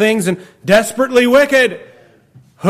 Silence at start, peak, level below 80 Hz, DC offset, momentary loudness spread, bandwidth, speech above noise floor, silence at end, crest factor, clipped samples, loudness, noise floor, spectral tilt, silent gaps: 0 s; -2 dBFS; -52 dBFS; under 0.1%; 11 LU; 16 kHz; 34 dB; 0 s; 12 dB; under 0.1%; -13 LUFS; -46 dBFS; -4.5 dB/octave; none